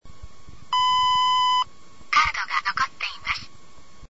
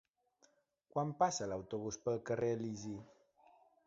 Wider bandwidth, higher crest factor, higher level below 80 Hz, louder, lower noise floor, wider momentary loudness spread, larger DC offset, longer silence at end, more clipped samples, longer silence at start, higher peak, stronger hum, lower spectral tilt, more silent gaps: about the same, 8 kHz vs 7.6 kHz; about the same, 18 dB vs 22 dB; first, -50 dBFS vs -72 dBFS; first, -22 LUFS vs -39 LUFS; second, -52 dBFS vs -74 dBFS; about the same, 10 LU vs 10 LU; first, 1% vs under 0.1%; second, 0 s vs 0.8 s; neither; second, 0 s vs 0.95 s; first, -8 dBFS vs -20 dBFS; neither; second, 0 dB/octave vs -5.5 dB/octave; neither